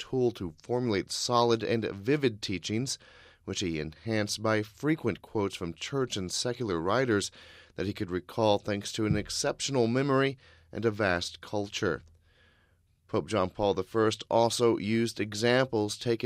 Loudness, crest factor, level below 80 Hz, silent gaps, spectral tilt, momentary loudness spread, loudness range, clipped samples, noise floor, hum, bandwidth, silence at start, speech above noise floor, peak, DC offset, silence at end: -30 LUFS; 20 dB; -58 dBFS; none; -4.5 dB/octave; 9 LU; 3 LU; under 0.1%; -67 dBFS; none; 16 kHz; 0 s; 38 dB; -10 dBFS; under 0.1%; 0 s